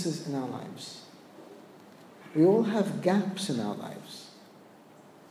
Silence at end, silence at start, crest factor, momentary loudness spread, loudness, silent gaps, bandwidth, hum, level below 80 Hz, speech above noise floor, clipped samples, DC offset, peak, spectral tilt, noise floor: 0.9 s; 0 s; 18 dB; 27 LU; -29 LUFS; none; 15.5 kHz; none; -84 dBFS; 25 dB; under 0.1%; under 0.1%; -12 dBFS; -6 dB/octave; -54 dBFS